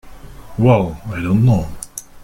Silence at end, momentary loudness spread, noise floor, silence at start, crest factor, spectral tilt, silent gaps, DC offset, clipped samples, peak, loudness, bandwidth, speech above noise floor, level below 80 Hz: 0.05 s; 17 LU; -35 dBFS; 0.05 s; 16 dB; -7.5 dB/octave; none; under 0.1%; under 0.1%; -2 dBFS; -16 LUFS; 15.5 kHz; 20 dB; -36 dBFS